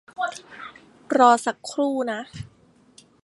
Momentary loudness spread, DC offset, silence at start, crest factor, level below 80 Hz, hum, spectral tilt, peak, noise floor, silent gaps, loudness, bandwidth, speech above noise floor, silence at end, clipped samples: 24 LU; under 0.1%; 0.2 s; 22 dB; -62 dBFS; none; -4 dB/octave; -2 dBFS; -55 dBFS; none; -22 LUFS; 11.5 kHz; 34 dB; 0.75 s; under 0.1%